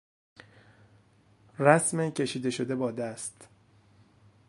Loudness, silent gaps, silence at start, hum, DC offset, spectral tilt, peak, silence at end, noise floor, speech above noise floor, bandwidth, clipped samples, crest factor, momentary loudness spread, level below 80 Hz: -28 LUFS; none; 1.6 s; none; under 0.1%; -4.5 dB/octave; -4 dBFS; 1.05 s; -62 dBFS; 34 dB; 11.5 kHz; under 0.1%; 28 dB; 17 LU; -72 dBFS